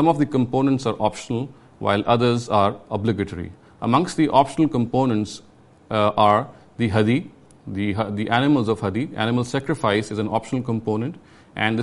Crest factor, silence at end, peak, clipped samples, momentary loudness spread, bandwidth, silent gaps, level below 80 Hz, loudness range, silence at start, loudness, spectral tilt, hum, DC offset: 18 dB; 0 s; -2 dBFS; under 0.1%; 11 LU; 11.5 kHz; none; -54 dBFS; 2 LU; 0 s; -21 LUFS; -6.5 dB/octave; none; under 0.1%